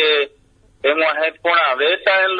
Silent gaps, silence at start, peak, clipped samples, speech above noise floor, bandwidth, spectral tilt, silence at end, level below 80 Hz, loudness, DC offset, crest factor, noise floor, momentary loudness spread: none; 0 s; -2 dBFS; under 0.1%; 37 dB; 6.8 kHz; -3.5 dB/octave; 0 s; -60 dBFS; -17 LUFS; under 0.1%; 16 dB; -53 dBFS; 5 LU